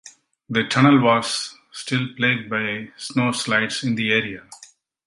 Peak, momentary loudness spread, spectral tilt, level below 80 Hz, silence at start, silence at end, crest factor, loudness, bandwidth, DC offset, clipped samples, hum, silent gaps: -2 dBFS; 14 LU; -4.5 dB/octave; -62 dBFS; 0.05 s; 0.4 s; 20 dB; -20 LUFS; 11.5 kHz; under 0.1%; under 0.1%; none; none